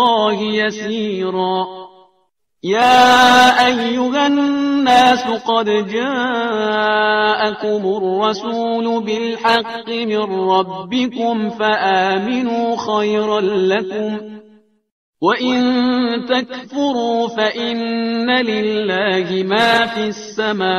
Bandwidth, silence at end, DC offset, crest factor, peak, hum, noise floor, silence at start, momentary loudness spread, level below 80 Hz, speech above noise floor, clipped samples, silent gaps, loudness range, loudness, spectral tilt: 15.5 kHz; 0 s; under 0.1%; 16 dB; 0 dBFS; none; -64 dBFS; 0 s; 9 LU; -58 dBFS; 49 dB; under 0.1%; 14.92-15.13 s; 6 LU; -16 LUFS; -4 dB/octave